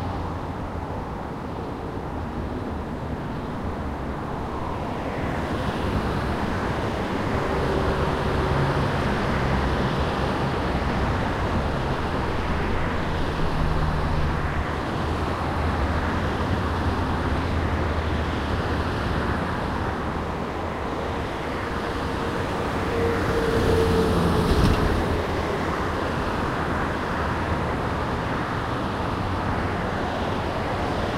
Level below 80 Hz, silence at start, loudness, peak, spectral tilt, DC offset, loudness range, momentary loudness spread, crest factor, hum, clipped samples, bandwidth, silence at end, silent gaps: -32 dBFS; 0 s; -26 LUFS; -6 dBFS; -6.5 dB/octave; under 0.1%; 6 LU; 8 LU; 18 dB; none; under 0.1%; 15.5 kHz; 0 s; none